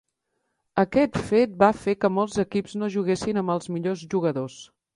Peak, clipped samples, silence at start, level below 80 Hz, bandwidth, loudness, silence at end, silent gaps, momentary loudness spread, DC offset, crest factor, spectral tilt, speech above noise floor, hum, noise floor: -4 dBFS; under 0.1%; 0.75 s; -56 dBFS; 11.5 kHz; -24 LUFS; 0.3 s; none; 8 LU; under 0.1%; 20 dB; -6.5 dB/octave; 53 dB; none; -77 dBFS